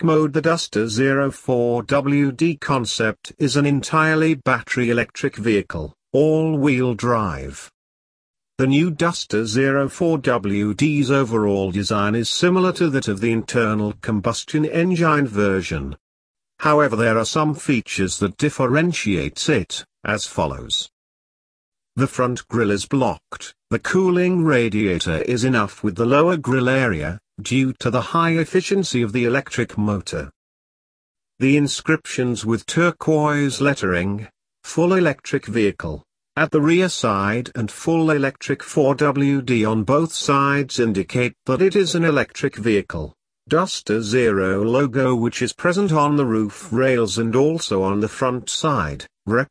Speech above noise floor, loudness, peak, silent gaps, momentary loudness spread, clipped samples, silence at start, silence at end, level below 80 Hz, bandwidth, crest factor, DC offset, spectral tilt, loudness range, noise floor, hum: over 71 dB; -19 LUFS; -2 dBFS; 7.74-8.34 s, 16.00-16.35 s, 20.92-21.72 s, 30.36-31.15 s; 7 LU; under 0.1%; 0 s; 0.05 s; -48 dBFS; 11 kHz; 16 dB; under 0.1%; -5.5 dB/octave; 3 LU; under -90 dBFS; none